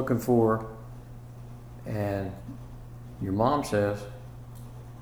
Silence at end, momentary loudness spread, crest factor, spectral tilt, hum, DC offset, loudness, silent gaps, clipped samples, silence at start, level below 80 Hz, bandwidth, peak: 0 s; 21 LU; 20 dB; -7.5 dB/octave; none; 0.1%; -28 LUFS; none; under 0.1%; 0 s; -50 dBFS; over 20 kHz; -10 dBFS